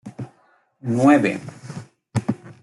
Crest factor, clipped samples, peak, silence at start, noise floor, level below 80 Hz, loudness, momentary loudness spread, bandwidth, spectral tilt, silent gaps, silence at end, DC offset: 18 dB; under 0.1%; -4 dBFS; 0.05 s; -60 dBFS; -62 dBFS; -20 LUFS; 22 LU; 11.5 kHz; -7 dB/octave; none; 0.1 s; under 0.1%